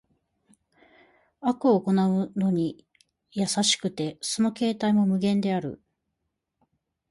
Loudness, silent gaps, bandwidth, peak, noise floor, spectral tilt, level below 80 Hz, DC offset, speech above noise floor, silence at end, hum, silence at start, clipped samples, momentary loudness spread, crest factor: -25 LUFS; none; 11.5 kHz; -10 dBFS; -81 dBFS; -5 dB/octave; -68 dBFS; under 0.1%; 56 dB; 1.35 s; none; 1.4 s; under 0.1%; 9 LU; 18 dB